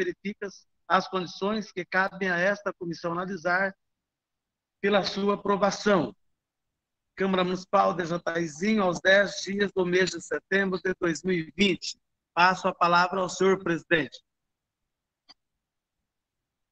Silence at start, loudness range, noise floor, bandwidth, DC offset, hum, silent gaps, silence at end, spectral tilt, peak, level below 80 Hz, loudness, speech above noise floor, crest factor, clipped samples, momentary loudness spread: 0 s; 4 LU; -87 dBFS; 8.6 kHz; under 0.1%; none; none; 2.55 s; -4.5 dB/octave; -6 dBFS; -64 dBFS; -26 LUFS; 60 dB; 22 dB; under 0.1%; 10 LU